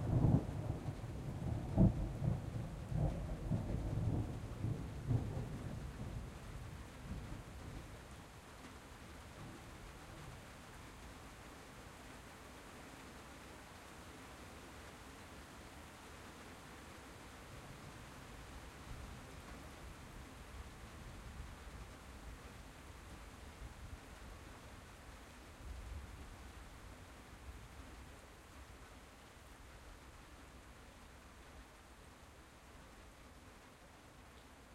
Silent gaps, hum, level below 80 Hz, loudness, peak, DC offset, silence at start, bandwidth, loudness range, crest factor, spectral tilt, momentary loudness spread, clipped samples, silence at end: none; none; -52 dBFS; -47 LUFS; -20 dBFS; under 0.1%; 0 s; 16 kHz; 18 LU; 26 dB; -6.5 dB/octave; 18 LU; under 0.1%; 0 s